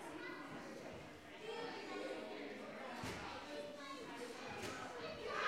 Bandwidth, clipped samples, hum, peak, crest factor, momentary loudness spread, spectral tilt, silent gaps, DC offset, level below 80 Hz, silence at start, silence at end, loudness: 16 kHz; under 0.1%; none; -28 dBFS; 20 dB; 5 LU; -4 dB/octave; none; under 0.1%; -74 dBFS; 0 s; 0 s; -49 LUFS